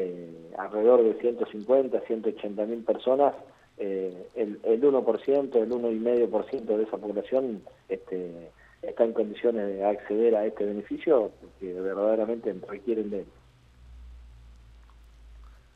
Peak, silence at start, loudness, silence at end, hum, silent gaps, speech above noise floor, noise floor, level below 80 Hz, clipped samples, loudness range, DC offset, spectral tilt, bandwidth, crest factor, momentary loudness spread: -8 dBFS; 0 s; -27 LUFS; 0.2 s; none; none; 28 dB; -55 dBFS; -58 dBFS; under 0.1%; 6 LU; under 0.1%; -8.5 dB/octave; 5 kHz; 20 dB; 14 LU